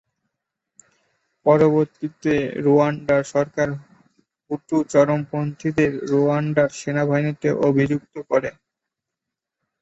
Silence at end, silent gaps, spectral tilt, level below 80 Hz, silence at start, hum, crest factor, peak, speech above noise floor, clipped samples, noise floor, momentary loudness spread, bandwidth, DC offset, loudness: 1.3 s; none; -7.5 dB/octave; -56 dBFS; 1.45 s; none; 18 dB; -4 dBFS; 65 dB; under 0.1%; -84 dBFS; 9 LU; 8.2 kHz; under 0.1%; -20 LUFS